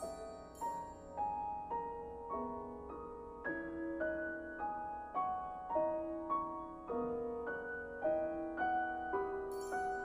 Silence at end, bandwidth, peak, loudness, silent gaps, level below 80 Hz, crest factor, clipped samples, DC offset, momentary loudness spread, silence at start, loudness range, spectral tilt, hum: 0 s; 14.5 kHz; -24 dBFS; -41 LUFS; none; -62 dBFS; 16 dB; under 0.1%; under 0.1%; 9 LU; 0 s; 4 LU; -6 dB/octave; none